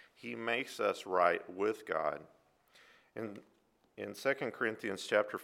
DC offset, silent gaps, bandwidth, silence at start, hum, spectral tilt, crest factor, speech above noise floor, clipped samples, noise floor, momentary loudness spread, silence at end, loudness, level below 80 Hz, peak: under 0.1%; none; 16.5 kHz; 0.2 s; none; -4 dB/octave; 24 dB; 30 dB; under 0.1%; -66 dBFS; 15 LU; 0 s; -36 LUFS; -82 dBFS; -14 dBFS